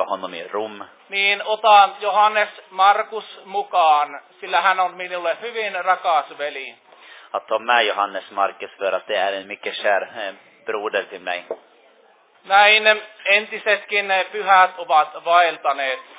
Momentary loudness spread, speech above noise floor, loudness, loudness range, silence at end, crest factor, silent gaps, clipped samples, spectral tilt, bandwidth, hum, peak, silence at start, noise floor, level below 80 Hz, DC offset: 15 LU; 35 dB; -19 LUFS; 7 LU; 0.15 s; 20 dB; none; under 0.1%; -5 dB/octave; 4 kHz; none; 0 dBFS; 0 s; -55 dBFS; -86 dBFS; under 0.1%